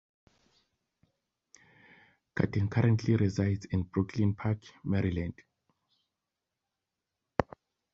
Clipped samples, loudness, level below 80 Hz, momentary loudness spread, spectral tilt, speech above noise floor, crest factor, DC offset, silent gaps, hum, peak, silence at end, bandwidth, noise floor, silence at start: under 0.1%; -31 LUFS; -50 dBFS; 9 LU; -8 dB/octave; 58 dB; 28 dB; under 0.1%; none; none; -4 dBFS; 0.5 s; 7.4 kHz; -88 dBFS; 2.35 s